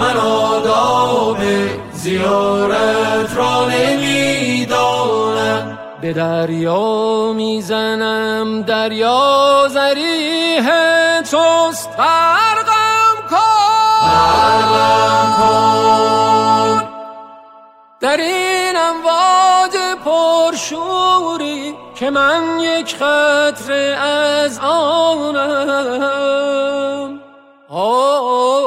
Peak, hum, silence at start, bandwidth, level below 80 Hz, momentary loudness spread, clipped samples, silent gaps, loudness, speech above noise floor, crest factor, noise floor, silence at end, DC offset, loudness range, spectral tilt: -2 dBFS; none; 0 s; 16 kHz; -52 dBFS; 7 LU; under 0.1%; none; -14 LUFS; 29 dB; 12 dB; -43 dBFS; 0 s; under 0.1%; 5 LU; -3.5 dB/octave